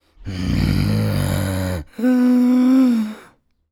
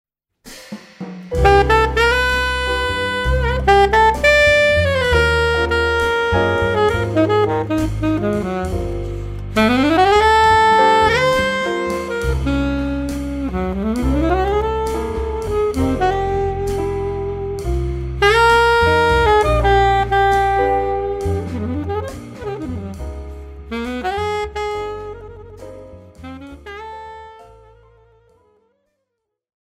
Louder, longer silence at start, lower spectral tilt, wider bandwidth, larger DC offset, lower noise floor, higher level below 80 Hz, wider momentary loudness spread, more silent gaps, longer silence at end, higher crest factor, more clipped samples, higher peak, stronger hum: about the same, -18 LUFS vs -16 LUFS; second, 0.2 s vs 0.45 s; first, -7 dB/octave vs -5.5 dB/octave; about the same, 16.5 kHz vs 15.5 kHz; neither; second, -51 dBFS vs -76 dBFS; second, -34 dBFS vs -28 dBFS; second, 12 LU vs 20 LU; neither; second, 0.5 s vs 2.2 s; second, 12 dB vs 18 dB; neither; second, -6 dBFS vs 0 dBFS; neither